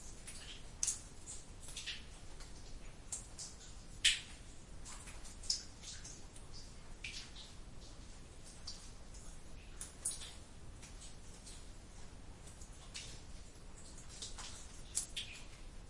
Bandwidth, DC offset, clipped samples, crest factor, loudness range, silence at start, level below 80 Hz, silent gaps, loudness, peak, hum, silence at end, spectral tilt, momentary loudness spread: 11.5 kHz; under 0.1%; under 0.1%; 32 dB; 12 LU; 0 s; -54 dBFS; none; -44 LUFS; -14 dBFS; none; 0 s; -0.5 dB/octave; 16 LU